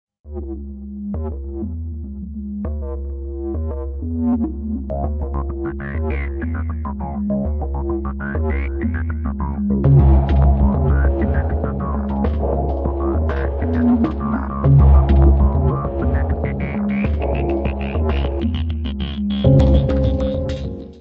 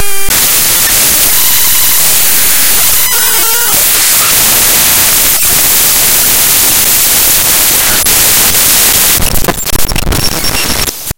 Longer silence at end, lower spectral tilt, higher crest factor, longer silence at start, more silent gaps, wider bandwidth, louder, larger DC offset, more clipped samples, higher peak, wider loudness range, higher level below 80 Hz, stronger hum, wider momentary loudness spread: about the same, 0 s vs 0 s; first, -10 dB/octave vs -0.5 dB/octave; first, 18 dB vs 8 dB; first, 0.25 s vs 0 s; neither; second, 4.4 kHz vs over 20 kHz; second, -19 LUFS vs -5 LUFS; neither; second, under 0.1% vs 3%; about the same, 0 dBFS vs 0 dBFS; first, 9 LU vs 1 LU; about the same, -20 dBFS vs -24 dBFS; neither; first, 14 LU vs 6 LU